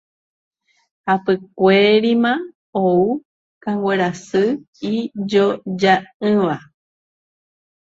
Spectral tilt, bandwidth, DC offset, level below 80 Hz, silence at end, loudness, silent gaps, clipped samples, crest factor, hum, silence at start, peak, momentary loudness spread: -6.5 dB/octave; 7.8 kHz; under 0.1%; -62 dBFS; 1.35 s; -18 LUFS; 2.55-2.73 s, 3.25-3.61 s, 4.68-4.73 s, 6.14-6.20 s; under 0.1%; 18 dB; none; 1.05 s; 0 dBFS; 12 LU